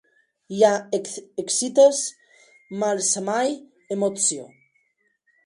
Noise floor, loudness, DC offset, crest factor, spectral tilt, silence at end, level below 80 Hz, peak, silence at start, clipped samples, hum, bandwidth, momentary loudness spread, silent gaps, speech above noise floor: -69 dBFS; -22 LUFS; under 0.1%; 20 dB; -2.5 dB/octave; 1 s; -74 dBFS; -4 dBFS; 0.5 s; under 0.1%; none; 11.5 kHz; 16 LU; none; 48 dB